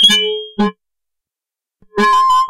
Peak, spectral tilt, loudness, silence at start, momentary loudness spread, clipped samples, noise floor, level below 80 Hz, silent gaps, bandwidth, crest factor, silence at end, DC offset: 0 dBFS; -2.5 dB/octave; -14 LUFS; 0 s; 10 LU; under 0.1%; -88 dBFS; -52 dBFS; none; 16 kHz; 14 dB; 0 s; under 0.1%